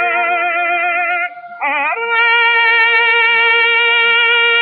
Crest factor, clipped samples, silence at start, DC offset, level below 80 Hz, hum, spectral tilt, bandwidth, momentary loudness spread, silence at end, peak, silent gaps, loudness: 10 dB; under 0.1%; 0 s; under 0.1%; -90 dBFS; none; 5.5 dB/octave; 4.6 kHz; 7 LU; 0 s; -2 dBFS; none; -11 LUFS